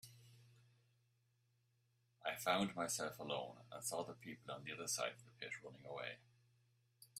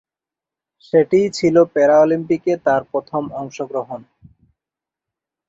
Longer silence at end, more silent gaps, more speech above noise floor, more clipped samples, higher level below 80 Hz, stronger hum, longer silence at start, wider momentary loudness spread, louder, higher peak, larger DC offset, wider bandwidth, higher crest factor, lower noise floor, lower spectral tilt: second, 0 s vs 1.5 s; neither; second, 35 dB vs 71 dB; neither; second, -84 dBFS vs -60 dBFS; neither; second, 0.05 s vs 0.95 s; about the same, 13 LU vs 14 LU; second, -45 LUFS vs -17 LUFS; second, -22 dBFS vs -2 dBFS; neither; first, 15.5 kHz vs 7.8 kHz; first, 26 dB vs 18 dB; second, -80 dBFS vs -88 dBFS; second, -2.5 dB/octave vs -6.5 dB/octave